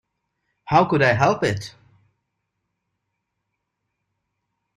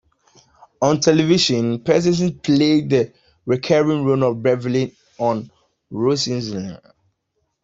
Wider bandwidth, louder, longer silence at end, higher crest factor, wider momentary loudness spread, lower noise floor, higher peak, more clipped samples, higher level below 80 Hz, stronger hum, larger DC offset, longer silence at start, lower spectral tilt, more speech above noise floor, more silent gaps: first, 13 kHz vs 8 kHz; about the same, -19 LUFS vs -18 LUFS; first, 3.1 s vs 0.85 s; about the same, 22 dB vs 18 dB; about the same, 13 LU vs 12 LU; first, -78 dBFS vs -72 dBFS; about the same, -2 dBFS vs -2 dBFS; neither; about the same, -56 dBFS vs -56 dBFS; neither; neither; second, 0.65 s vs 0.8 s; about the same, -6 dB/octave vs -5.5 dB/octave; first, 60 dB vs 54 dB; neither